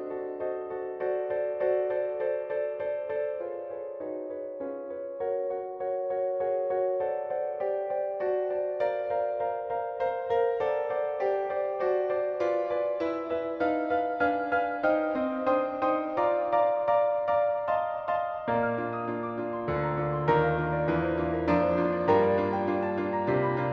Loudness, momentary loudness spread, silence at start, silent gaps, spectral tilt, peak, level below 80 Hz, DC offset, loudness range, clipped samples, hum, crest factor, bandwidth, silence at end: -29 LUFS; 8 LU; 0 s; none; -9 dB/octave; -10 dBFS; -56 dBFS; under 0.1%; 6 LU; under 0.1%; none; 18 dB; 6.2 kHz; 0 s